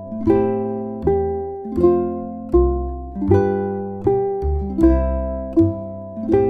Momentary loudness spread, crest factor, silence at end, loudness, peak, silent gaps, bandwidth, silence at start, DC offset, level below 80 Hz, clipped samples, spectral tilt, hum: 9 LU; 16 dB; 0 s; -20 LUFS; -2 dBFS; none; 4.7 kHz; 0 s; under 0.1%; -28 dBFS; under 0.1%; -11 dB/octave; none